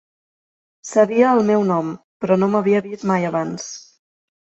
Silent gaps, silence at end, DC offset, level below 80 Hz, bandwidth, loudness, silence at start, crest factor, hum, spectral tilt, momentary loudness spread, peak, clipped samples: 2.04-2.20 s; 0.6 s; under 0.1%; -64 dBFS; 8.2 kHz; -18 LUFS; 0.85 s; 18 dB; none; -6.5 dB/octave; 15 LU; -2 dBFS; under 0.1%